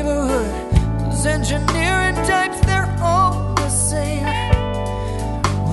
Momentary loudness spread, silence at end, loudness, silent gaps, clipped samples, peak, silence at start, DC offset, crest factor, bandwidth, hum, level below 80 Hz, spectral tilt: 5 LU; 0 s; -19 LUFS; none; under 0.1%; 0 dBFS; 0 s; under 0.1%; 18 dB; 12 kHz; none; -26 dBFS; -5 dB/octave